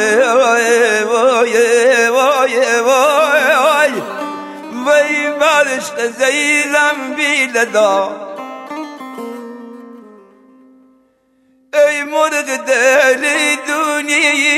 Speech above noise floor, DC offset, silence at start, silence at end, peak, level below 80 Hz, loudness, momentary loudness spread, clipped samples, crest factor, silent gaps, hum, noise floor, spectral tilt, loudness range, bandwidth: 42 dB; under 0.1%; 0 s; 0 s; -2 dBFS; -68 dBFS; -12 LUFS; 16 LU; under 0.1%; 12 dB; none; none; -56 dBFS; -1 dB/octave; 10 LU; 16 kHz